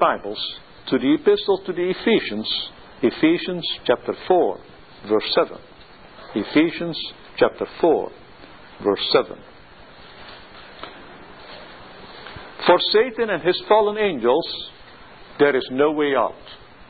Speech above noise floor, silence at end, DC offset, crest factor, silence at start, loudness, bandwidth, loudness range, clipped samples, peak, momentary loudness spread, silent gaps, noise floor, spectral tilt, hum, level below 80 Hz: 25 dB; 0.35 s; 0.3%; 22 dB; 0 s; -21 LUFS; 4.8 kHz; 7 LU; under 0.1%; 0 dBFS; 22 LU; none; -45 dBFS; -9 dB/octave; none; -56 dBFS